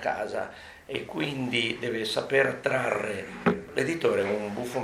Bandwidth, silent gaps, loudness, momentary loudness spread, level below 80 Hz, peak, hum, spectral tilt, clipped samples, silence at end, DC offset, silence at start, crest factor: 15.5 kHz; none; -28 LUFS; 10 LU; -62 dBFS; -10 dBFS; none; -5 dB/octave; under 0.1%; 0 s; under 0.1%; 0 s; 18 dB